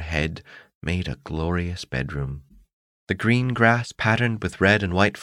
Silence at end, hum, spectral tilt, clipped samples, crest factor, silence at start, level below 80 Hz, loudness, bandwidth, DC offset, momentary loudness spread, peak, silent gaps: 0 s; none; -6 dB/octave; under 0.1%; 20 dB; 0 s; -40 dBFS; -23 LUFS; 11 kHz; under 0.1%; 12 LU; -4 dBFS; 0.75-0.81 s, 2.73-3.07 s